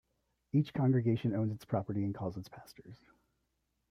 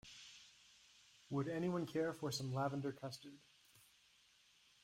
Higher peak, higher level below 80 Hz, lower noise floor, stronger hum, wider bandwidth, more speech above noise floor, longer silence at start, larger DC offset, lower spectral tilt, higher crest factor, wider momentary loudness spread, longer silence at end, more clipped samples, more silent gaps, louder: first, -18 dBFS vs -28 dBFS; first, -68 dBFS vs -78 dBFS; first, -81 dBFS vs -72 dBFS; neither; second, 14.5 kHz vs 16 kHz; first, 48 dB vs 30 dB; first, 0.55 s vs 0.05 s; neither; first, -9 dB/octave vs -5.5 dB/octave; about the same, 16 dB vs 18 dB; about the same, 22 LU vs 23 LU; about the same, 0.95 s vs 1.05 s; neither; neither; first, -34 LUFS vs -43 LUFS